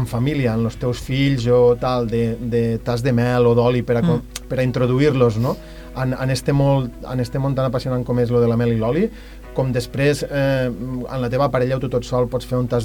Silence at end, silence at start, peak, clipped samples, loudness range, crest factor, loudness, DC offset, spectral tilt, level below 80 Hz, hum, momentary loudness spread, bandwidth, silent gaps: 0 s; 0 s; -4 dBFS; under 0.1%; 3 LU; 16 dB; -19 LUFS; under 0.1%; -7 dB/octave; -38 dBFS; none; 9 LU; 18.5 kHz; none